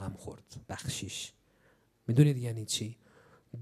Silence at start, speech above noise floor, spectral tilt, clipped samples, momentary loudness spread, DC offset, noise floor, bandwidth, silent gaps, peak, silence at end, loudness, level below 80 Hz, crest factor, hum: 0 s; 36 dB; -5.5 dB/octave; under 0.1%; 21 LU; under 0.1%; -68 dBFS; 14 kHz; none; -10 dBFS; 0 s; -32 LUFS; -64 dBFS; 24 dB; none